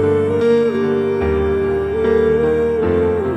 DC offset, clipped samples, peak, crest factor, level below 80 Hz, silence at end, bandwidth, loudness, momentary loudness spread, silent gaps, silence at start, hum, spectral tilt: under 0.1%; under 0.1%; -4 dBFS; 10 dB; -34 dBFS; 0 s; 8.4 kHz; -16 LUFS; 3 LU; none; 0 s; none; -8.5 dB/octave